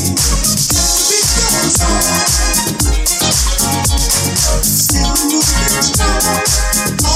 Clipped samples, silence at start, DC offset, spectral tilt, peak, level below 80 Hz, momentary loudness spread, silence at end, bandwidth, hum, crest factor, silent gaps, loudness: under 0.1%; 0 s; under 0.1%; -2.5 dB/octave; 0 dBFS; -20 dBFS; 3 LU; 0 s; 16.5 kHz; none; 12 dB; none; -11 LUFS